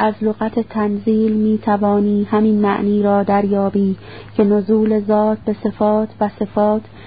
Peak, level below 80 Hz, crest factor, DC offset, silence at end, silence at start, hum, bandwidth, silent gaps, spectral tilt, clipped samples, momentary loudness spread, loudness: -2 dBFS; -48 dBFS; 14 dB; 0.5%; 0 s; 0 s; none; 4.9 kHz; none; -13 dB/octave; under 0.1%; 6 LU; -17 LUFS